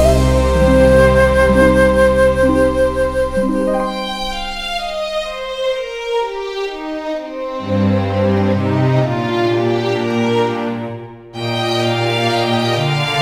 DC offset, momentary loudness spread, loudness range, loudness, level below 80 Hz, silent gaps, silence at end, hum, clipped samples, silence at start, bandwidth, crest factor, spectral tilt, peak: under 0.1%; 12 LU; 9 LU; -16 LUFS; -26 dBFS; none; 0 s; none; under 0.1%; 0 s; 15.5 kHz; 14 dB; -6 dB/octave; 0 dBFS